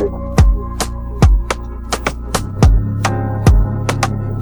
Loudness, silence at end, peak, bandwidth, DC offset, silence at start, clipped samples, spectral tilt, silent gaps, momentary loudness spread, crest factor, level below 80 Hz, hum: -16 LUFS; 0 s; 0 dBFS; over 20 kHz; under 0.1%; 0 s; under 0.1%; -6 dB/octave; none; 9 LU; 14 dB; -16 dBFS; none